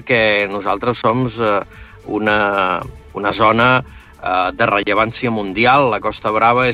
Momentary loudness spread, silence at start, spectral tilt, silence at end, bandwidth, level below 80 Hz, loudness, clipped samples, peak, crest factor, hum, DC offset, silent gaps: 9 LU; 0 s; -7.5 dB/octave; 0 s; 10.5 kHz; -42 dBFS; -16 LUFS; under 0.1%; -2 dBFS; 14 dB; none; under 0.1%; none